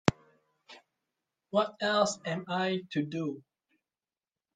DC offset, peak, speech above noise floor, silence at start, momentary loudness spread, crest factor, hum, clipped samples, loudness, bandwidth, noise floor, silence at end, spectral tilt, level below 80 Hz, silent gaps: under 0.1%; -2 dBFS; over 59 dB; 0.05 s; 9 LU; 32 dB; none; under 0.1%; -31 LUFS; 9.6 kHz; under -90 dBFS; 1.15 s; -4.5 dB/octave; -66 dBFS; none